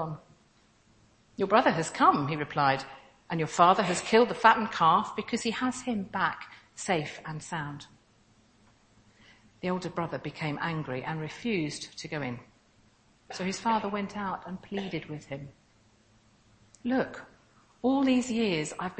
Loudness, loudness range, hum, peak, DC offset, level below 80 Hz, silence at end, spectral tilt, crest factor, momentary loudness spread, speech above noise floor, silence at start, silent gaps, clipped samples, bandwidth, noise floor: -29 LUFS; 12 LU; none; -6 dBFS; under 0.1%; -64 dBFS; 0 s; -5 dB/octave; 24 dB; 16 LU; 35 dB; 0 s; none; under 0.1%; 8.8 kHz; -64 dBFS